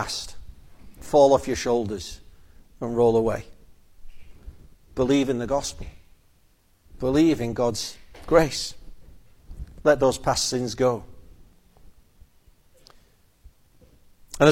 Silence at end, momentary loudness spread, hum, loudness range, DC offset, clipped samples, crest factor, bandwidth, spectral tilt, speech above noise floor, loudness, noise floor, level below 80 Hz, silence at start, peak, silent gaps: 0 s; 20 LU; none; 5 LU; under 0.1%; under 0.1%; 24 dB; 16.5 kHz; -5 dB/octave; 38 dB; -23 LUFS; -60 dBFS; -44 dBFS; 0 s; -2 dBFS; none